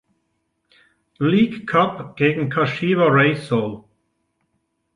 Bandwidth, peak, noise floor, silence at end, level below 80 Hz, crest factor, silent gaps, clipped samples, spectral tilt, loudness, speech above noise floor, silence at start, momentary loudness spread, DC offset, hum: 11 kHz; -4 dBFS; -72 dBFS; 1.15 s; -60 dBFS; 18 dB; none; under 0.1%; -8 dB/octave; -19 LUFS; 53 dB; 1.2 s; 8 LU; under 0.1%; none